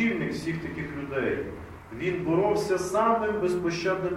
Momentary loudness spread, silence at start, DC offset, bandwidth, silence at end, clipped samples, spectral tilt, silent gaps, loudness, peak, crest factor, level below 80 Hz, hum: 10 LU; 0 s; under 0.1%; 14.5 kHz; 0 s; under 0.1%; -6 dB/octave; none; -27 LUFS; -12 dBFS; 16 dB; -54 dBFS; none